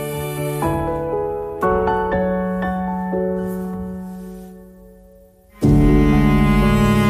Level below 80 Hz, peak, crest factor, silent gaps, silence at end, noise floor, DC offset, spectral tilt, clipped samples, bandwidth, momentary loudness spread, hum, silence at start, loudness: -28 dBFS; -4 dBFS; 16 dB; none; 0 s; -47 dBFS; under 0.1%; -7.5 dB/octave; under 0.1%; 15.5 kHz; 16 LU; none; 0 s; -19 LUFS